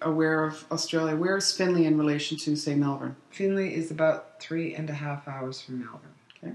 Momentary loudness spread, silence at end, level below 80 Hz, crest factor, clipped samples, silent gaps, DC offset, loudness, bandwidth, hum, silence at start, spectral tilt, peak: 12 LU; 0 s; -80 dBFS; 16 dB; under 0.1%; none; under 0.1%; -28 LUFS; 12 kHz; none; 0 s; -5 dB/octave; -12 dBFS